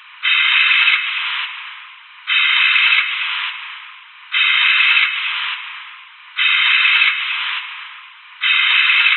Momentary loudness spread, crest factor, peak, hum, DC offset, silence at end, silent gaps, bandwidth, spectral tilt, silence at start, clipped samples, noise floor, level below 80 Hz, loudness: 19 LU; 16 dB; 0 dBFS; none; under 0.1%; 0 s; none; 4.4 kHz; 20.5 dB/octave; 0.15 s; under 0.1%; -39 dBFS; under -90 dBFS; -13 LUFS